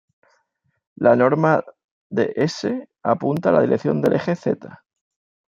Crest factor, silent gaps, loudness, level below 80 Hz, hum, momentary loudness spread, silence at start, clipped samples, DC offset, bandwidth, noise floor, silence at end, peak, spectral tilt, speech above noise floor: 20 dB; 1.84-2.10 s; -20 LUFS; -64 dBFS; none; 10 LU; 1 s; under 0.1%; under 0.1%; 10.5 kHz; -70 dBFS; 0.7 s; -2 dBFS; -7 dB/octave; 51 dB